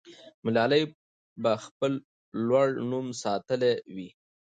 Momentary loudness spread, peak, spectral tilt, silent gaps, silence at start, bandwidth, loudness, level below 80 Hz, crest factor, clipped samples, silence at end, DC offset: 13 LU; -12 dBFS; -5.5 dB/octave; 0.34-0.43 s, 0.95-1.36 s, 1.71-1.80 s, 2.04-2.32 s; 0.05 s; 9.2 kHz; -28 LUFS; -72 dBFS; 18 dB; under 0.1%; 0.4 s; under 0.1%